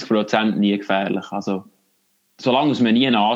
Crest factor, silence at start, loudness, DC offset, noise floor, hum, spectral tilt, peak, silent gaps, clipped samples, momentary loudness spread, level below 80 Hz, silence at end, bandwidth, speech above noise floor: 16 dB; 0 s; -19 LUFS; under 0.1%; -65 dBFS; none; -6 dB/octave; -4 dBFS; none; under 0.1%; 10 LU; -74 dBFS; 0 s; 7.6 kHz; 47 dB